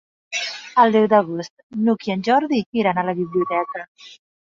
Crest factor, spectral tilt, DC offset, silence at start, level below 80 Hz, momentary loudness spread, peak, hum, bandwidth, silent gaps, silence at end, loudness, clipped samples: 18 dB; -5.5 dB/octave; under 0.1%; 0.3 s; -66 dBFS; 14 LU; -2 dBFS; none; 7.6 kHz; 1.50-1.57 s, 1.63-1.70 s, 2.66-2.72 s, 3.88-3.95 s; 0.45 s; -20 LUFS; under 0.1%